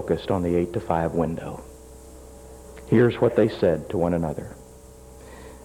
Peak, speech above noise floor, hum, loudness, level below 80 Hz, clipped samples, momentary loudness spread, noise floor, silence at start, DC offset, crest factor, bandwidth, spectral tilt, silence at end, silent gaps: -6 dBFS; 23 dB; none; -23 LUFS; -46 dBFS; under 0.1%; 25 LU; -45 dBFS; 0 s; under 0.1%; 18 dB; 16 kHz; -7.5 dB/octave; 0 s; none